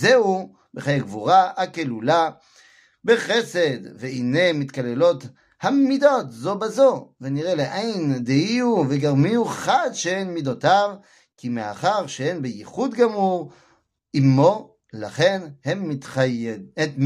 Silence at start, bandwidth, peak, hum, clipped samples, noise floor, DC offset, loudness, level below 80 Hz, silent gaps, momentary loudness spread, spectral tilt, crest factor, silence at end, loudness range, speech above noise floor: 0 s; 12.5 kHz; -4 dBFS; none; under 0.1%; -61 dBFS; under 0.1%; -21 LUFS; -66 dBFS; none; 12 LU; -5.5 dB/octave; 18 dB; 0 s; 2 LU; 40 dB